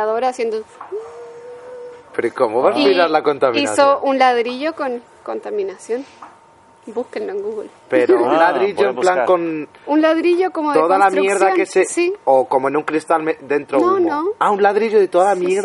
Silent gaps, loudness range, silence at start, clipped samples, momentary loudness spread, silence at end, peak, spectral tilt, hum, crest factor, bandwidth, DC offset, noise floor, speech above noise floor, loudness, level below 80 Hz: none; 6 LU; 0 s; under 0.1%; 15 LU; 0 s; 0 dBFS; -4 dB/octave; none; 16 dB; 11.5 kHz; under 0.1%; -48 dBFS; 32 dB; -16 LUFS; -68 dBFS